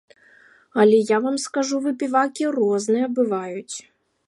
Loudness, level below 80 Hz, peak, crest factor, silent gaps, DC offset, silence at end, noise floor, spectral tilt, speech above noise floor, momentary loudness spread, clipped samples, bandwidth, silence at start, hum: -21 LUFS; -76 dBFS; -4 dBFS; 18 dB; none; under 0.1%; 0.45 s; -53 dBFS; -4.5 dB/octave; 33 dB; 14 LU; under 0.1%; 11.5 kHz; 0.75 s; none